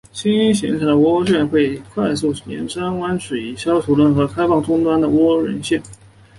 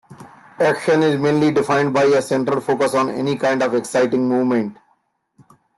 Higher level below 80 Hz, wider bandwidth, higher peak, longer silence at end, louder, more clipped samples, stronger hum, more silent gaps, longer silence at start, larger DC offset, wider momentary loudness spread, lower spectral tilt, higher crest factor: first, -48 dBFS vs -62 dBFS; about the same, 11.5 kHz vs 12.5 kHz; about the same, -4 dBFS vs -6 dBFS; second, 0.45 s vs 1.05 s; about the same, -17 LUFS vs -18 LUFS; neither; neither; neither; about the same, 0.15 s vs 0.1 s; neither; first, 8 LU vs 4 LU; about the same, -6 dB/octave vs -6 dB/octave; about the same, 14 dB vs 14 dB